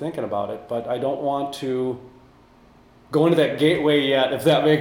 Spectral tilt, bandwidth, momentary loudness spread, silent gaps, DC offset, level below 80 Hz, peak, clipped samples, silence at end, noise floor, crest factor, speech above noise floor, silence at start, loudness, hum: -6 dB/octave; 16.5 kHz; 10 LU; none; under 0.1%; -60 dBFS; -4 dBFS; under 0.1%; 0 s; -52 dBFS; 18 dB; 31 dB; 0 s; -21 LUFS; none